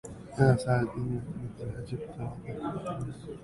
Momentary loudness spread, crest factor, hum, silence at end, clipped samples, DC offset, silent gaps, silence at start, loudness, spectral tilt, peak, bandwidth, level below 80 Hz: 14 LU; 22 dB; none; 0 s; under 0.1%; under 0.1%; none; 0.05 s; -32 LUFS; -7.5 dB/octave; -8 dBFS; 11.5 kHz; -52 dBFS